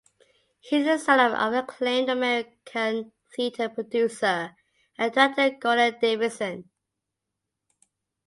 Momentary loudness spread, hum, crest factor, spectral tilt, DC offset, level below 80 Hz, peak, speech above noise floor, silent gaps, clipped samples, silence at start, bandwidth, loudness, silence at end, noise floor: 12 LU; none; 20 dB; -3.5 dB/octave; under 0.1%; -74 dBFS; -6 dBFS; 60 dB; none; under 0.1%; 0.65 s; 11.5 kHz; -24 LUFS; 1.65 s; -84 dBFS